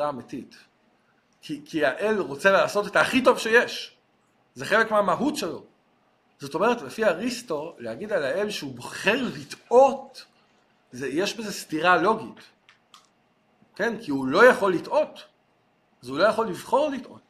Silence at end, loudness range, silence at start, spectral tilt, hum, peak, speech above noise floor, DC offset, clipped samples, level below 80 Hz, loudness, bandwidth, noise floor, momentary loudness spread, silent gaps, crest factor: 0.1 s; 5 LU; 0 s; -4 dB/octave; none; -4 dBFS; 42 dB; under 0.1%; under 0.1%; -66 dBFS; -23 LUFS; 15 kHz; -66 dBFS; 18 LU; none; 20 dB